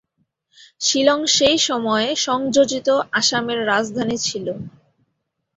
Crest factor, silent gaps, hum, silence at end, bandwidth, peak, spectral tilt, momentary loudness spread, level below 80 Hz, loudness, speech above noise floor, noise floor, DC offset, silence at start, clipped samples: 18 dB; none; none; 0.9 s; 8.2 kHz; -2 dBFS; -2 dB/octave; 8 LU; -58 dBFS; -18 LUFS; 55 dB; -74 dBFS; under 0.1%; 0.8 s; under 0.1%